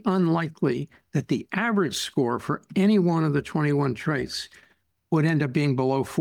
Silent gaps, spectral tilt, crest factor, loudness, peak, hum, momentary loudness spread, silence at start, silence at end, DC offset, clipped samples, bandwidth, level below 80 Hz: none; -6.5 dB/octave; 14 dB; -25 LUFS; -10 dBFS; none; 8 LU; 0.05 s; 0 s; under 0.1%; under 0.1%; 17 kHz; -60 dBFS